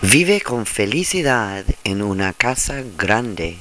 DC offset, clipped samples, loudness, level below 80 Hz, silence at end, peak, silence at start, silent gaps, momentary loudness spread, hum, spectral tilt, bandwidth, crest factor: 0.4%; under 0.1%; -18 LUFS; -34 dBFS; 0 s; 0 dBFS; 0 s; none; 7 LU; none; -3.5 dB/octave; 11 kHz; 18 dB